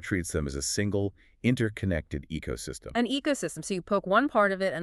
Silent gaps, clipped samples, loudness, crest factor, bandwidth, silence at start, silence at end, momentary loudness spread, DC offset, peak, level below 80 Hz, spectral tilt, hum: none; under 0.1%; -29 LUFS; 18 dB; 13.5 kHz; 0 s; 0 s; 11 LU; under 0.1%; -10 dBFS; -46 dBFS; -5 dB/octave; none